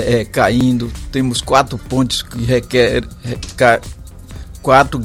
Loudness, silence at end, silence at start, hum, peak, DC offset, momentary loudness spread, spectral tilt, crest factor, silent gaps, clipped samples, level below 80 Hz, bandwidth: -15 LUFS; 0 s; 0 s; none; 0 dBFS; under 0.1%; 16 LU; -5 dB/octave; 16 dB; none; under 0.1%; -32 dBFS; 16 kHz